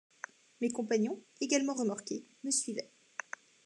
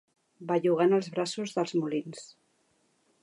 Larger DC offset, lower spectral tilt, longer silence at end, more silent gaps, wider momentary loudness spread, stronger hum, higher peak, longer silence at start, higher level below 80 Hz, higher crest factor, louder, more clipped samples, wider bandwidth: neither; second, -3 dB/octave vs -5.5 dB/octave; second, 0.8 s vs 0.95 s; neither; second, 17 LU vs 20 LU; neither; about the same, -16 dBFS vs -14 dBFS; first, 0.6 s vs 0.4 s; second, under -90 dBFS vs -82 dBFS; about the same, 20 dB vs 18 dB; second, -35 LUFS vs -29 LUFS; neither; about the same, 12.5 kHz vs 11.5 kHz